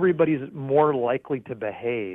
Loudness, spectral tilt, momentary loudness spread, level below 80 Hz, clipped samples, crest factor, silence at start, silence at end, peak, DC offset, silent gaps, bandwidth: -24 LUFS; -10.5 dB/octave; 9 LU; -64 dBFS; under 0.1%; 16 dB; 0 s; 0 s; -8 dBFS; under 0.1%; none; 3.9 kHz